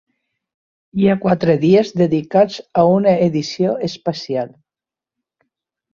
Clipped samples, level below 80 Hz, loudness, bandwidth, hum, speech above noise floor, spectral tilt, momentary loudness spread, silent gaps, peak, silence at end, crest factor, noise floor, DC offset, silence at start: under 0.1%; -56 dBFS; -16 LUFS; 7.2 kHz; none; 73 dB; -7.5 dB/octave; 10 LU; none; 0 dBFS; 1.45 s; 16 dB; -89 dBFS; under 0.1%; 0.95 s